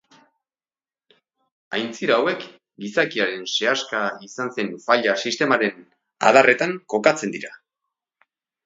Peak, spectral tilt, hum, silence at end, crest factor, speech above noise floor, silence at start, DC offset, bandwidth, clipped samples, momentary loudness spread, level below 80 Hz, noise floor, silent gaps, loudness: 0 dBFS; -3.5 dB/octave; none; 1.1 s; 22 dB; over 69 dB; 1.7 s; under 0.1%; 7.8 kHz; under 0.1%; 13 LU; -74 dBFS; under -90 dBFS; none; -21 LUFS